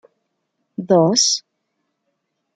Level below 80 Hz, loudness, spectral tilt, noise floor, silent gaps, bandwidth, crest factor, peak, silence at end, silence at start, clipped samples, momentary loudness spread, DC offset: -68 dBFS; -16 LUFS; -3.5 dB/octave; -73 dBFS; none; 11 kHz; 18 dB; -2 dBFS; 1.15 s; 0.8 s; under 0.1%; 19 LU; under 0.1%